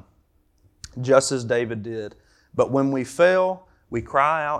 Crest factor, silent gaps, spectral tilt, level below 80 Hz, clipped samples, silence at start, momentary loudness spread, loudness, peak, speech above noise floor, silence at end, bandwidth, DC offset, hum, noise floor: 20 dB; none; -5 dB/octave; -56 dBFS; under 0.1%; 0.95 s; 15 LU; -22 LUFS; -2 dBFS; 41 dB; 0 s; 12.5 kHz; under 0.1%; none; -62 dBFS